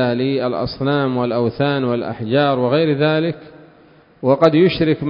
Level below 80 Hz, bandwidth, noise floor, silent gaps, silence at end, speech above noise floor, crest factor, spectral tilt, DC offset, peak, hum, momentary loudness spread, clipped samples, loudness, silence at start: -50 dBFS; 6.6 kHz; -48 dBFS; none; 0 s; 32 dB; 18 dB; -9 dB/octave; under 0.1%; 0 dBFS; none; 8 LU; under 0.1%; -17 LUFS; 0 s